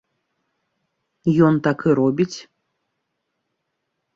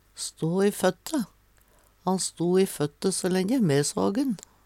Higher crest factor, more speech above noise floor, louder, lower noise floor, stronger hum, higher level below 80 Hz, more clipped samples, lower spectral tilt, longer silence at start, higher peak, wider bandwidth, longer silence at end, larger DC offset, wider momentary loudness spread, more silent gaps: about the same, 20 dB vs 16 dB; first, 59 dB vs 35 dB; first, -19 LUFS vs -26 LUFS; first, -76 dBFS vs -60 dBFS; neither; about the same, -62 dBFS vs -64 dBFS; neither; first, -7.5 dB/octave vs -5 dB/octave; first, 1.25 s vs 0.15 s; first, -4 dBFS vs -10 dBFS; second, 7.6 kHz vs 16.5 kHz; first, 1.75 s vs 0.3 s; neither; about the same, 9 LU vs 8 LU; neither